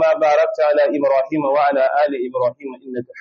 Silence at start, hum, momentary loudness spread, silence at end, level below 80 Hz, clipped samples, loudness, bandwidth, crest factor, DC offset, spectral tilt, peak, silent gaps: 0 s; none; 14 LU; 0 s; -72 dBFS; under 0.1%; -17 LUFS; 6.8 kHz; 10 dB; under 0.1%; -3.5 dB/octave; -6 dBFS; none